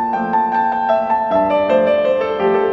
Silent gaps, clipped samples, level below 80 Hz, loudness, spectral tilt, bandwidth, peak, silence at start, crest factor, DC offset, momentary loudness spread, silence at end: none; under 0.1%; -54 dBFS; -16 LUFS; -7.5 dB/octave; 7 kHz; -4 dBFS; 0 s; 12 dB; under 0.1%; 3 LU; 0 s